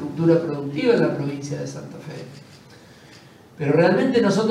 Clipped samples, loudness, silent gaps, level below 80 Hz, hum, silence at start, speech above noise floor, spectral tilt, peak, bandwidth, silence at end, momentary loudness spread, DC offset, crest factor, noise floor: under 0.1%; -20 LUFS; none; -66 dBFS; none; 0 s; 26 dB; -6.5 dB/octave; -4 dBFS; 12 kHz; 0 s; 19 LU; under 0.1%; 18 dB; -47 dBFS